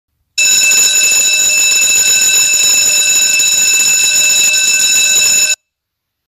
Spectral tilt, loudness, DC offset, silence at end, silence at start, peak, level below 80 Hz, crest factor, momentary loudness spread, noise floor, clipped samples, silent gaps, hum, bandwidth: 3.5 dB/octave; -7 LUFS; under 0.1%; 0.7 s; 0.35 s; 0 dBFS; -50 dBFS; 10 dB; 2 LU; -75 dBFS; under 0.1%; none; none; 15.5 kHz